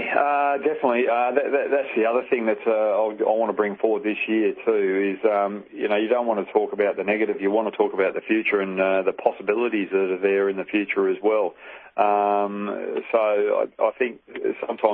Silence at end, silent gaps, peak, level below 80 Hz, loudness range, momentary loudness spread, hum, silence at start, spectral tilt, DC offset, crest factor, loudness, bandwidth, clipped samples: 0 s; none; -4 dBFS; -72 dBFS; 1 LU; 5 LU; none; 0 s; -9.5 dB/octave; under 0.1%; 18 dB; -23 LUFS; 4.2 kHz; under 0.1%